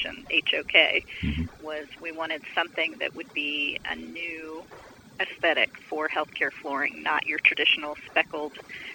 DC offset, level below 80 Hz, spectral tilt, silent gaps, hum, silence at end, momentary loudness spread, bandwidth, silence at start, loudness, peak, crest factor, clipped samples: under 0.1%; -50 dBFS; -4.5 dB/octave; none; none; 0 s; 15 LU; 16.5 kHz; 0 s; -26 LUFS; -4 dBFS; 26 dB; under 0.1%